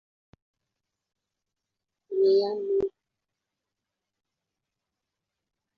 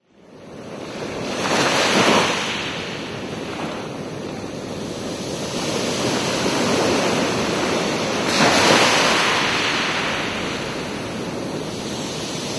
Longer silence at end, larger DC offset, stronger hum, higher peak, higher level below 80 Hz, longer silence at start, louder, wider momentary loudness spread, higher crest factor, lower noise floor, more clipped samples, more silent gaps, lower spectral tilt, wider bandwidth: first, 2.9 s vs 0 s; neither; neither; second, -14 dBFS vs 0 dBFS; second, -70 dBFS vs -50 dBFS; first, 2.1 s vs 0.3 s; second, -26 LUFS vs -20 LUFS; second, 12 LU vs 15 LU; about the same, 18 dB vs 20 dB; first, -86 dBFS vs -44 dBFS; neither; neither; first, -7.5 dB/octave vs -3 dB/octave; second, 5.8 kHz vs 11 kHz